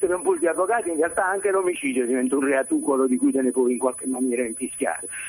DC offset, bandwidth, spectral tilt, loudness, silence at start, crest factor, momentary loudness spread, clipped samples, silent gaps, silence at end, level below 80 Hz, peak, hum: under 0.1%; 15 kHz; -3.5 dB/octave; -23 LUFS; 0 s; 14 dB; 5 LU; under 0.1%; none; 0 s; -64 dBFS; -8 dBFS; none